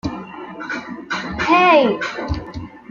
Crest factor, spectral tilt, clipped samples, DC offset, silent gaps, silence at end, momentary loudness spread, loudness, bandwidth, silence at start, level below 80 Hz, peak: 18 dB; -5.5 dB/octave; under 0.1%; under 0.1%; none; 0.1 s; 20 LU; -18 LUFS; 7.4 kHz; 0.05 s; -40 dBFS; -2 dBFS